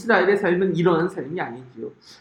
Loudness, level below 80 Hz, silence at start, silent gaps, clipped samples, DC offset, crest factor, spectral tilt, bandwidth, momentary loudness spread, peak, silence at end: -21 LUFS; -62 dBFS; 0 s; none; under 0.1%; under 0.1%; 18 dB; -7 dB/octave; 10.5 kHz; 19 LU; -4 dBFS; 0.1 s